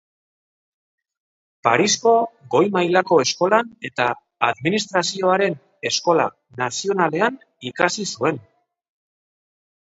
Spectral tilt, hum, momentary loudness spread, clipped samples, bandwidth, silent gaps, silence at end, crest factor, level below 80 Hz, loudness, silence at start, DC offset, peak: -3.5 dB/octave; none; 9 LU; under 0.1%; 8 kHz; none; 1.5 s; 22 dB; -68 dBFS; -20 LUFS; 1.65 s; under 0.1%; 0 dBFS